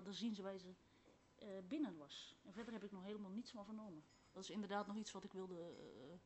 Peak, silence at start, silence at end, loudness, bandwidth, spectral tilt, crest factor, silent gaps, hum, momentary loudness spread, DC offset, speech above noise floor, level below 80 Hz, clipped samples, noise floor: -32 dBFS; 0 s; 0 s; -52 LUFS; 8.2 kHz; -5 dB/octave; 20 dB; none; none; 12 LU; under 0.1%; 21 dB; -84 dBFS; under 0.1%; -72 dBFS